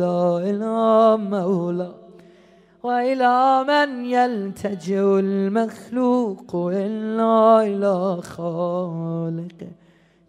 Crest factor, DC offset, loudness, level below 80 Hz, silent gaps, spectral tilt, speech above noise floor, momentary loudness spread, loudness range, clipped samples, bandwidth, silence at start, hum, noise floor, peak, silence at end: 18 dB; under 0.1%; -20 LUFS; -68 dBFS; none; -7.5 dB/octave; 32 dB; 12 LU; 2 LU; under 0.1%; 12 kHz; 0 s; none; -52 dBFS; -4 dBFS; 0.55 s